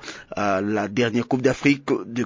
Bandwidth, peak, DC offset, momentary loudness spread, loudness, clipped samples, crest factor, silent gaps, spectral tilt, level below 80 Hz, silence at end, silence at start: 7.6 kHz; -2 dBFS; under 0.1%; 6 LU; -22 LUFS; under 0.1%; 20 dB; none; -6 dB/octave; -54 dBFS; 0 s; 0 s